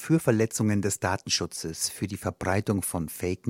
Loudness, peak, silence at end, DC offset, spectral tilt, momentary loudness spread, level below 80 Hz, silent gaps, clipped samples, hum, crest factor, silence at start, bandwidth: -27 LUFS; -8 dBFS; 0 s; under 0.1%; -4.5 dB/octave; 7 LU; -58 dBFS; none; under 0.1%; none; 18 dB; 0 s; 16.5 kHz